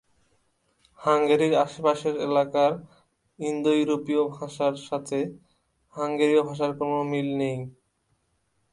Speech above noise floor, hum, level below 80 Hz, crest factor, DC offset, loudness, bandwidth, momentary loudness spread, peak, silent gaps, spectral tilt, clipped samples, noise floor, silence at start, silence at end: 47 dB; none; -70 dBFS; 18 dB; under 0.1%; -25 LUFS; 11.5 kHz; 11 LU; -8 dBFS; none; -6 dB/octave; under 0.1%; -72 dBFS; 1 s; 1 s